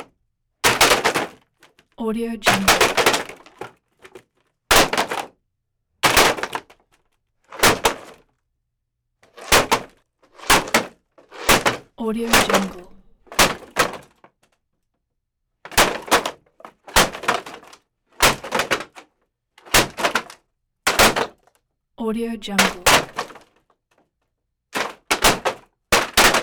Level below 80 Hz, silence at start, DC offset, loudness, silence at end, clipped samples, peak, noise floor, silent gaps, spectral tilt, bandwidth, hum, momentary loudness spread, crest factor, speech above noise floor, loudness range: -40 dBFS; 0 s; under 0.1%; -18 LUFS; 0 s; under 0.1%; -4 dBFS; -76 dBFS; none; -2 dB/octave; over 20 kHz; none; 17 LU; 18 dB; 57 dB; 3 LU